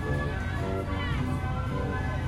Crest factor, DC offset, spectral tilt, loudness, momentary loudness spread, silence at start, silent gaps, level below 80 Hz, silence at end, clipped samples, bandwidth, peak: 12 dB; under 0.1%; -7 dB/octave; -31 LUFS; 1 LU; 0 s; none; -36 dBFS; 0 s; under 0.1%; 13 kHz; -18 dBFS